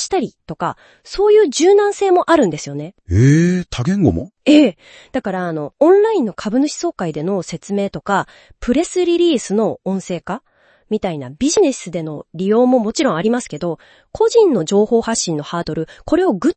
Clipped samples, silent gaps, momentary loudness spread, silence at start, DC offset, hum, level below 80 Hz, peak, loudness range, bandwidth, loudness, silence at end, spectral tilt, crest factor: under 0.1%; none; 13 LU; 0 s; under 0.1%; none; -46 dBFS; 0 dBFS; 5 LU; 8.8 kHz; -16 LUFS; 0.05 s; -5.5 dB/octave; 16 dB